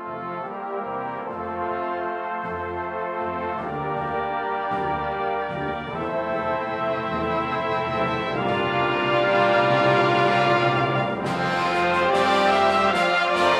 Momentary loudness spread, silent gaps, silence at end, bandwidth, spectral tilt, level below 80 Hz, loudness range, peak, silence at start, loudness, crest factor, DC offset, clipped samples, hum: 10 LU; none; 0 s; 13 kHz; -5.5 dB/octave; -52 dBFS; 8 LU; -6 dBFS; 0 s; -23 LUFS; 16 dB; under 0.1%; under 0.1%; none